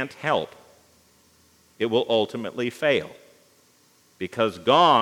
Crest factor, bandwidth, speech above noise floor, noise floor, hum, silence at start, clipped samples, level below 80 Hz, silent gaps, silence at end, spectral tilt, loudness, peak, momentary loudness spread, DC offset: 20 dB; 17 kHz; 37 dB; -60 dBFS; none; 0 s; under 0.1%; -72 dBFS; none; 0 s; -5 dB/octave; -23 LUFS; -4 dBFS; 15 LU; under 0.1%